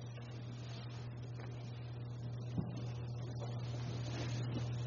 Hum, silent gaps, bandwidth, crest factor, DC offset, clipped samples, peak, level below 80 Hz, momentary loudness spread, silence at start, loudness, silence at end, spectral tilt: none; none; 7.2 kHz; 18 dB; under 0.1%; under 0.1%; -26 dBFS; -62 dBFS; 6 LU; 0 s; -44 LUFS; 0 s; -6.5 dB/octave